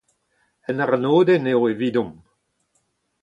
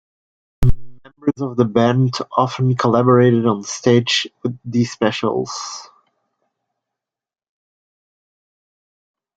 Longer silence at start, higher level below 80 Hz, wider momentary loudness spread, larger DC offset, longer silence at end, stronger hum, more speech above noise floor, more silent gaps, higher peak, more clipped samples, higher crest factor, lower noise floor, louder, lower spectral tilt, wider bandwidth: about the same, 0.7 s vs 0.6 s; second, -64 dBFS vs -36 dBFS; about the same, 14 LU vs 12 LU; neither; second, 1.1 s vs 3.5 s; neither; second, 51 dB vs 72 dB; neither; second, -6 dBFS vs -2 dBFS; neither; about the same, 16 dB vs 18 dB; second, -69 dBFS vs -89 dBFS; about the same, -20 LUFS vs -18 LUFS; first, -8 dB/octave vs -6 dB/octave; second, 7.4 kHz vs 8.8 kHz